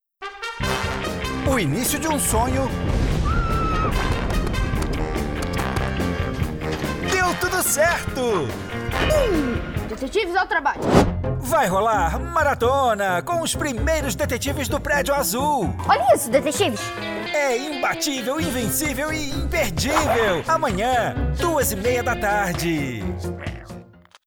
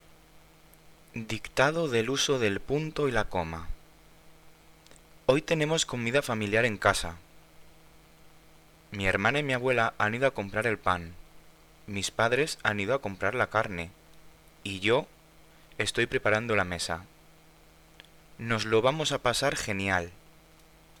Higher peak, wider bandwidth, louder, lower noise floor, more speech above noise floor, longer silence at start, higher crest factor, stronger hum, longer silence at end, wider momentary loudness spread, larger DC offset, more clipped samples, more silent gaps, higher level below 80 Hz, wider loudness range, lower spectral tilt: first, -2 dBFS vs -6 dBFS; about the same, over 20 kHz vs 20 kHz; first, -22 LUFS vs -28 LUFS; second, -44 dBFS vs -57 dBFS; second, 23 dB vs 28 dB; second, 0.2 s vs 0.35 s; about the same, 20 dB vs 24 dB; neither; second, 0.4 s vs 0.85 s; second, 7 LU vs 13 LU; neither; neither; neither; first, -32 dBFS vs -52 dBFS; about the same, 3 LU vs 3 LU; about the same, -4.5 dB/octave vs -4 dB/octave